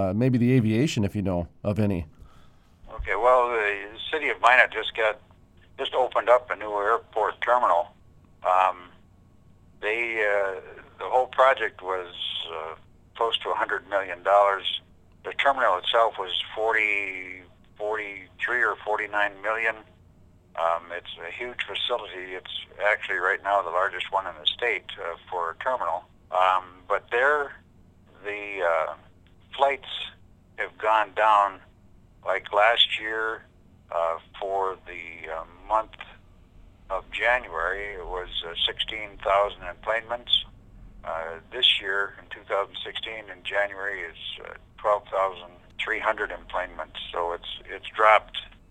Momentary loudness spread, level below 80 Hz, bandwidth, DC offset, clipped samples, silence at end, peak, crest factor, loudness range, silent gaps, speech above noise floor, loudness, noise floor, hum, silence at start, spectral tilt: 15 LU; -54 dBFS; 11.5 kHz; under 0.1%; under 0.1%; 0.25 s; -2 dBFS; 26 dB; 6 LU; none; 29 dB; -25 LUFS; -55 dBFS; none; 0 s; -5 dB/octave